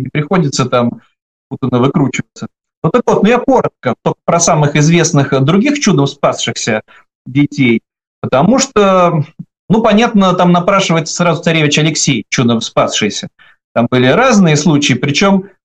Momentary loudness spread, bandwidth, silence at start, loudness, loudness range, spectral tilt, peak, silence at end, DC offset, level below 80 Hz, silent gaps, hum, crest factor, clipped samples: 9 LU; 9.2 kHz; 0 s; -11 LUFS; 3 LU; -5 dB/octave; 0 dBFS; 0.2 s; under 0.1%; -46 dBFS; 1.22-1.50 s, 2.77-2.82 s, 7.15-7.25 s, 8.07-8.22 s, 9.59-9.68 s, 13.64-13.75 s; none; 10 dB; under 0.1%